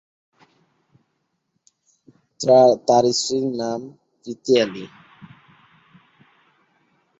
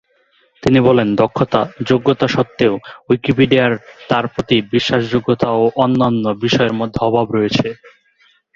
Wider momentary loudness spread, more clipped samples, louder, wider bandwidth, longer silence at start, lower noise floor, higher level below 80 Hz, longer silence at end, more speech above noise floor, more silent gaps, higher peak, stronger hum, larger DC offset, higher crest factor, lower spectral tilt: first, 24 LU vs 6 LU; neither; second, -18 LUFS vs -15 LUFS; about the same, 8.2 kHz vs 7.6 kHz; first, 2.4 s vs 0.65 s; first, -73 dBFS vs -57 dBFS; second, -68 dBFS vs -46 dBFS; first, 2.35 s vs 0.8 s; first, 55 dB vs 42 dB; neither; about the same, -2 dBFS vs 0 dBFS; neither; neither; about the same, 20 dB vs 16 dB; second, -4 dB/octave vs -6.5 dB/octave